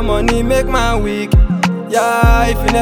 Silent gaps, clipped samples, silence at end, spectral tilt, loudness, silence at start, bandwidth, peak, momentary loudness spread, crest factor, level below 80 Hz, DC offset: none; under 0.1%; 0 s; -5.5 dB/octave; -14 LUFS; 0 s; 19.5 kHz; 0 dBFS; 4 LU; 12 dB; -16 dBFS; under 0.1%